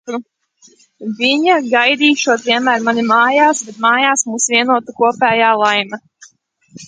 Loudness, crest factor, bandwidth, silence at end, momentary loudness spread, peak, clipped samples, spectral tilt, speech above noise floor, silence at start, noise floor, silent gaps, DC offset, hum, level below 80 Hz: -13 LUFS; 14 dB; 9.6 kHz; 0 s; 11 LU; 0 dBFS; under 0.1%; -2 dB/octave; 37 dB; 0.05 s; -51 dBFS; none; under 0.1%; none; -64 dBFS